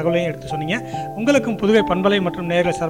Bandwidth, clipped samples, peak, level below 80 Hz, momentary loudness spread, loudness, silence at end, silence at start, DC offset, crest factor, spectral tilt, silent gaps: 16.5 kHz; under 0.1%; -4 dBFS; -48 dBFS; 8 LU; -19 LUFS; 0 s; 0 s; 0.3%; 16 dB; -6 dB/octave; none